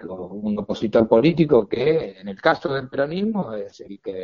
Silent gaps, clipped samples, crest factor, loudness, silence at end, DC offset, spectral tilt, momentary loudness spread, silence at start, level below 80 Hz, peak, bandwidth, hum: none; under 0.1%; 20 dB; -21 LUFS; 0 s; under 0.1%; -5.5 dB/octave; 17 LU; 0 s; -52 dBFS; 0 dBFS; 7.2 kHz; none